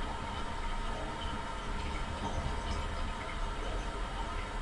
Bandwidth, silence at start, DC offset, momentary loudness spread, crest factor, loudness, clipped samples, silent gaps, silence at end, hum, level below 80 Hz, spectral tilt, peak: 11.5 kHz; 0 s; under 0.1%; 2 LU; 16 dB; -39 LUFS; under 0.1%; none; 0 s; none; -40 dBFS; -4.5 dB/octave; -22 dBFS